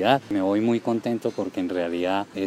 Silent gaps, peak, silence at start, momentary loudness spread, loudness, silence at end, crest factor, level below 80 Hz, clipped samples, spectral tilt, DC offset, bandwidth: none; -6 dBFS; 0 s; 5 LU; -25 LUFS; 0 s; 18 dB; -66 dBFS; under 0.1%; -6.5 dB/octave; under 0.1%; 13.5 kHz